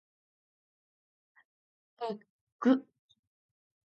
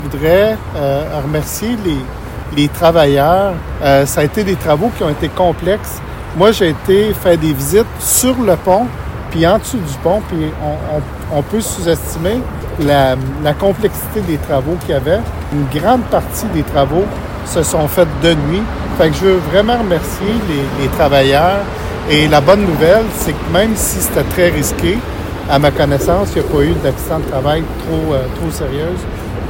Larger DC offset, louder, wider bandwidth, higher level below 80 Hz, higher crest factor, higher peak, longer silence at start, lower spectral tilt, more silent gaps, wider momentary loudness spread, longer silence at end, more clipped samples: neither; second, -32 LUFS vs -14 LUFS; second, 6.6 kHz vs 17 kHz; second, under -90 dBFS vs -28 dBFS; first, 24 dB vs 14 dB; second, -14 dBFS vs 0 dBFS; first, 2 s vs 0 s; about the same, -4.5 dB/octave vs -5 dB/octave; first, 2.30-2.59 s vs none; first, 13 LU vs 9 LU; first, 1.15 s vs 0 s; second, under 0.1% vs 0.2%